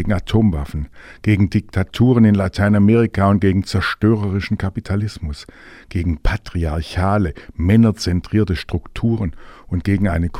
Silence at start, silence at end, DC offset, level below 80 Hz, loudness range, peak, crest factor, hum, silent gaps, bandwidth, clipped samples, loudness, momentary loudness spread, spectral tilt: 0 s; 0 s; under 0.1%; -30 dBFS; 6 LU; 0 dBFS; 16 dB; none; none; 12.5 kHz; under 0.1%; -18 LUFS; 12 LU; -7.5 dB/octave